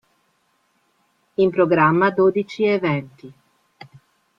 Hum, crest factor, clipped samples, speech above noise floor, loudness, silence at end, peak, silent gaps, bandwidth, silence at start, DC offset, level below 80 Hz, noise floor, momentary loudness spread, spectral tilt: none; 18 dB; under 0.1%; 48 dB; -19 LUFS; 1.05 s; -4 dBFS; none; 7 kHz; 1.4 s; under 0.1%; -62 dBFS; -66 dBFS; 11 LU; -8 dB/octave